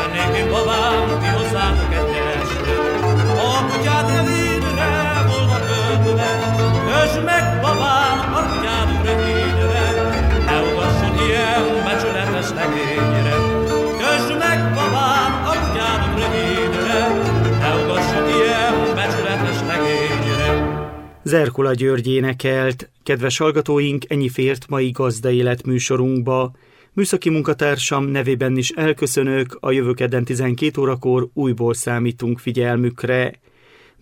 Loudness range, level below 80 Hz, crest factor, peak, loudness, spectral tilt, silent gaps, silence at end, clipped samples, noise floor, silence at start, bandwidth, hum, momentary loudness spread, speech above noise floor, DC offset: 2 LU; -30 dBFS; 14 dB; -4 dBFS; -18 LUFS; -5.5 dB/octave; none; 0.7 s; under 0.1%; -50 dBFS; 0 s; 16.5 kHz; none; 4 LU; 32 dB; under 0.1%